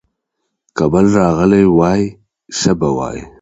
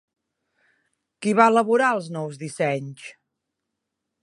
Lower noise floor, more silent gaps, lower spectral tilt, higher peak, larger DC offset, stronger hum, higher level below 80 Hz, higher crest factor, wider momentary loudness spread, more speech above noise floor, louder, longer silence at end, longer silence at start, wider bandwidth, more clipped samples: second, -73 dBFS vs -82 dBFS; neither; about the same, -6.5 dB/octave vs -5.5 dB/octave; about the same, 0 dBFS vs -2 dBFS; neither; neither; first, -38 dBFS vs -78 dBFS; second, 14 dB vs 24 dB; second, 13 LU vs 20 LU; about the same, 61 dB vs 60 dB; first, -13 LUFS vs -21 LUFS; second, 0.15 s vs 1.1 s; second, 0.75 s vs 1.2 s; second, 8.2 kHz vs 11.5 kHz; neither